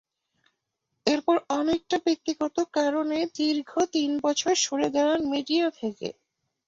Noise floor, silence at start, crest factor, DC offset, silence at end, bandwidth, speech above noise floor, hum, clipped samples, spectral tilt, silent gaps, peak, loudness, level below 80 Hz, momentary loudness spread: -81 dBFS; 1.05 s; 20 dB; under 0.1%; 0.55 s; 7.8 kHz; 55 dB; none; under 0.1%; -2.5 dB/octave; none; -6 dBFS; -26 LUFS; -66 dBFS; 5 LU